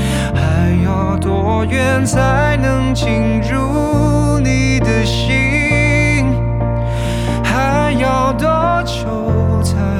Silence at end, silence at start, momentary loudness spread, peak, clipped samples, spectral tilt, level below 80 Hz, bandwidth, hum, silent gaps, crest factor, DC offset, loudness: 0 s; 0 s; 4 LU; 0 dBFS; under 0.1%; -6 dB/octave; -24 dBFS; 13.5 kHz; none; none; 12 dB; under 0.1%; -14 LUFS